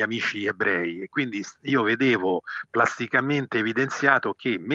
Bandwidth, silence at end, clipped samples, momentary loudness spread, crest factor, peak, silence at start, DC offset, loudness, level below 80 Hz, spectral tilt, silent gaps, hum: 7.8 kHz; 0 s; under 0.1%; 7 LU; 22 dB; -2 dBFS; 0 s; under 0.1%; -24 LUFS; -76 dBFS; -5 dB/octave; none; none